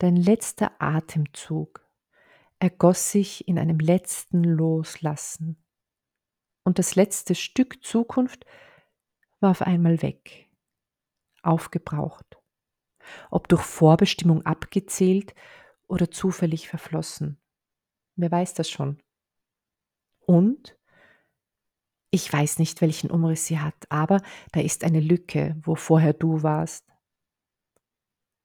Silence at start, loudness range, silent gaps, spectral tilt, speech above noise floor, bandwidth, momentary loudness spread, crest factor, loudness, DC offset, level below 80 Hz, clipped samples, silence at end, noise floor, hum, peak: 0 s; 6 LU; none; -6 dB/octave; 65 dB; 17.5 kHz; 12 LU; 20 dB; -24 LUFS; under 0.1%; -58 dBFS; under 0.1%; 1.65 s; -87 dBFS; none; -4 dBFS